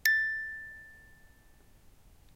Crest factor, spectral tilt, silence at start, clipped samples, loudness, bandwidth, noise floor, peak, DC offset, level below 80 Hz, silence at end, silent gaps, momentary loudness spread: 26 dB; 1 dB/octave; 0.05 s; under 0.1%; -31 LUFS; 16 kHz; -59 dBFS; -10 dBFS; under 0.1%; -62 dBFS; 1.35 s; none; 26 LU